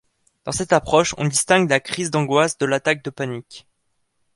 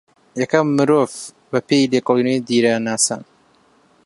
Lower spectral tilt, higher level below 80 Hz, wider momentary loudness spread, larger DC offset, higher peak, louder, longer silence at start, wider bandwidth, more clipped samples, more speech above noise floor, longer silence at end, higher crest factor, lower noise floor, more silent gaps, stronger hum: about the same, -4 dB/octave vs -4 dB/octave; first, -52 dBFS vs -66 dBFS; first, 12 LU vs 9 LU; neither; about the same, -2 dBFS vs 0 dBFS; about the same, -19 LUFS vs -17 LUFS; about the same, 0.45 s vs 0.35 s; about the same, 11.5 kHz vs 11.5 kHz; neither; first, 50 dB vs 38 dB; about the same, 0.75 s vs 0.85 s; about the same, 20 dB vs 18 dB; first, -70 dBFS vs -55 dBFS; neither; neither